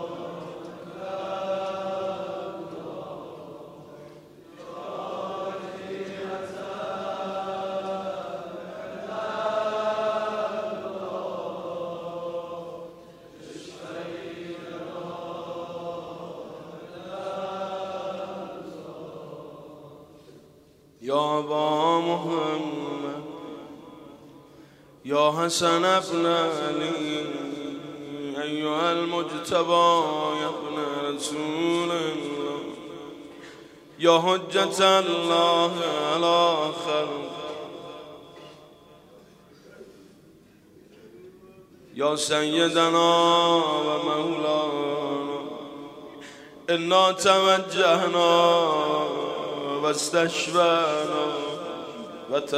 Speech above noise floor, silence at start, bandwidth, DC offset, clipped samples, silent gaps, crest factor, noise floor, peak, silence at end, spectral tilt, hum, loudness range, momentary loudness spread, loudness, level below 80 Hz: 33 dB; 0 s; 15.5 kHz; under 0.1%; under 0.1%; none; 22 dB; -55 dBFS; -4 dBFS; 0 s; -3.5 dB/octave; none; 15 LU; 21 LU; -25 LUFS; -70 dBFS